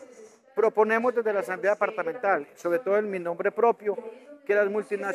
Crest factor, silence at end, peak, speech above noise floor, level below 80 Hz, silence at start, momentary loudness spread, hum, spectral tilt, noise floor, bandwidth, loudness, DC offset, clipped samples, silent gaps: 18 dB; 0 s; -8 dBFS; 25 dB; -84 dBFS; 0 s; 9 LU; none; -6 dB/octave; -51 dBFS; 13.5 kHz; -26 LUFS; under 0.1%; under 0.1%; none